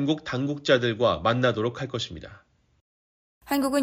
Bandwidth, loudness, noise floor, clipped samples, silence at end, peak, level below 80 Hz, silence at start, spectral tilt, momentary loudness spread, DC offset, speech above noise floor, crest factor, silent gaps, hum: 16 kHz; -25 LUFS; under -90 dBFS; under 0.1%; 0 s; -8 dBFS; -56 dBFS; 0 s; -5.5 dB/octave; 9 LU; under 0.1%; over 65 dB; 18 dB; 2.81-3.41 s; none